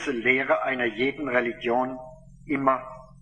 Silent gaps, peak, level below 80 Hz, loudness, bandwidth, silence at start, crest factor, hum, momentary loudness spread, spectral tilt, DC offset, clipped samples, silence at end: none; -6 dBFS; -56 dBFS; -25 LUFS; 9.6 kHz; 0 s; 20 dB; none; 9 LU; -5.5 dB/octave; under 0.1%; under 0.1%; 0.1 s